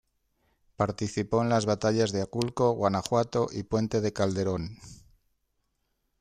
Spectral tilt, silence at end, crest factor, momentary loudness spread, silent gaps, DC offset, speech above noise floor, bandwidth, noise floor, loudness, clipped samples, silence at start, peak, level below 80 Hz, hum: -6 dB/octave; 1.25 s; 20 dB; 6 LU; none; under 0.1%; 49 dB; 14 kHz; -77 dBFS; -28 LUFS; under 0.1%; 0.8 s; -10 dBFS; -58 dBFS; none